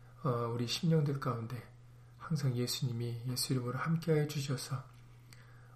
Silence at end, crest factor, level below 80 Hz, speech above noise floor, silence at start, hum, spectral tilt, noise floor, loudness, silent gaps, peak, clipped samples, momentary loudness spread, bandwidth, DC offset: 0 s; 16 dB; -66 dBFS; 21 dB; 0 s; none; -5.5 dB/octave; -56 dBFS; -35 LUFS; none; -20 dBFS; under 0.1%; 12 LU; 15.5 kHz; under 0.1%